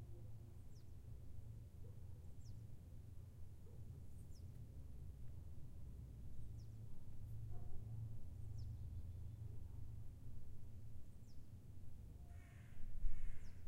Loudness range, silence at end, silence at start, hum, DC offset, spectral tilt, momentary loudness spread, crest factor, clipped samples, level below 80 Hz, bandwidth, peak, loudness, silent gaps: 5 LU; 0 s; 0 s; none; under 0.1%; -7.5 dB/octave; 7 LU; 20 dB; under 0.1%; -54 dBFS; 5.8 kHz; -26 dBFS; -57 LUFS; none